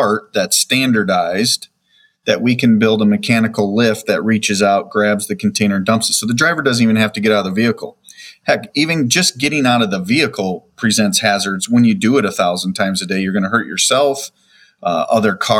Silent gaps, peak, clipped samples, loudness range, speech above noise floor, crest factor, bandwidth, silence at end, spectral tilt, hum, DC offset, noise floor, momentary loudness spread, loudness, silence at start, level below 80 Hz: none; 0 dBFS; under 0.1%; 1 LU; 41 dB; 14 dB; 16.5 kHz; 0 s; -4 dB/octave; none; under 0.1%; -56 dBFS; 6 LU; -15 LUFS; 0 s; -60 dBFS